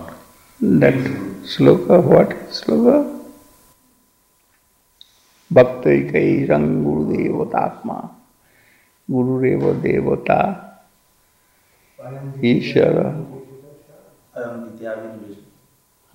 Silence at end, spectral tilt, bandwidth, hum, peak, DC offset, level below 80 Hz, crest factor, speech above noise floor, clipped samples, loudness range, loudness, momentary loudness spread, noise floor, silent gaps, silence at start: 0.8 s; -8 dB/octave; 16 kHz; none; 0 dBFS; under 0.1%; -50 dBFS; 18 dB; 43 dB; under 0.1%; 6 LU; -17 LUFS; 20 LU; -60 dBFS; none; 0 s